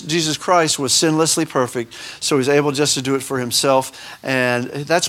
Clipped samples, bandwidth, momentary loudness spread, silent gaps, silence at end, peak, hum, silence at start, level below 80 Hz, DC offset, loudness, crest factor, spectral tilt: under 0.1%; 17.5 kHz; 8 LU; none; 0 s; -2 dBFS; none; 0 s; -60 dBFS; under 0.1%; -17 LUFS; 18 dB; -3 dB/octave